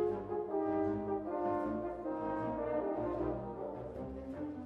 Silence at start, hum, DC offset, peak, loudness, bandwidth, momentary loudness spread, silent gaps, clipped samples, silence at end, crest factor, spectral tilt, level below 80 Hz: 0 s; none; under 0.1%; -24 dBFS; -38 LUFS; 5.4 kHz; 8 LU; none; under 0.1%; 0 s; 14 dB; -10 dB/octave; -58 dBFS